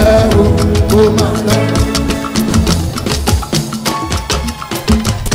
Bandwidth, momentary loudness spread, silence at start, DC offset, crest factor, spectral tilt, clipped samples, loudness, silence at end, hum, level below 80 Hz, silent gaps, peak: 16.5 kHz; 7 LU; 0 s; under 0.1%; 12 dB; -5 dB/octave; under 0.1%; -13 LUFS; 0 s; none; -20 dBFS; none; 0 dBFS